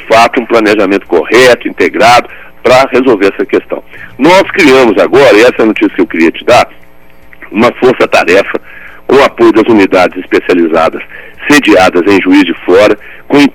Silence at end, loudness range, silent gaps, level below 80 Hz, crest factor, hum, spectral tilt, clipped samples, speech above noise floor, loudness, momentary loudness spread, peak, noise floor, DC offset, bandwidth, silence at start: 0.05 s; 2 LU; none; -38 dBFS; 6 dB; none; -4.5 dB/octave; 6%; 25 dB; -6 LUFS; 8 LU; 0 dBFS; -31 dBFS; under 0.1%; 18 kHz; 0 s